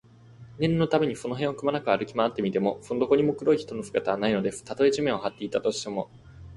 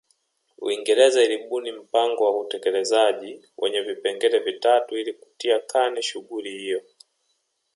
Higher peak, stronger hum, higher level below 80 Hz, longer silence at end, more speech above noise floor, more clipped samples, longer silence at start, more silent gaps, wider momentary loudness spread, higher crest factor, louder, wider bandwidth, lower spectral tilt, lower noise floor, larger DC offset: second, -8 dBFS vs -4 dBFS; neither; first, -58 dBFS vs -84 dBFS; second, 0 s vs 0.95 s; second, 23 dB vs 50 dB; neither; second, 0.3 s vs 0.6 s; neither; second, 7 LU vs 13 LU; about the same, 18 dB vs 18 dB; second, -26 LUFS vs -23 LUFS; about the same, 11.5 kHz vs 11.5 kHz; first, -6 dB/octave vs -1 dB/octave; second, -49 dBFS vs -72 dBFS; neither